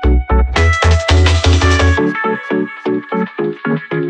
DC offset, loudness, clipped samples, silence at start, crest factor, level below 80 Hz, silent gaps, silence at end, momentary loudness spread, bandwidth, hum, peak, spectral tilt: under 0.1%; -14 LUFS; under 0.1%; 0 s; 12 dB; -18 dBFS; none; 0 s; 9 LU; 9.2 kHz; none; 0 dBFS; -5.5 dB/octave